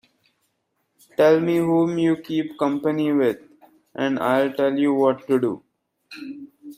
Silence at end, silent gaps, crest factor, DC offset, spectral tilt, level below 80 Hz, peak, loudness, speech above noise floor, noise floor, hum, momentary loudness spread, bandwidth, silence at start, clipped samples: 0.05 s; none; 16 dB; under 0.1%; -7 dB/octave; -68 dBFS; -6 dBFS; -21 LUFS; 52 dB; -73 dBFS; none; 18 LU; 16 kHz; 1.2 s; under 0.1%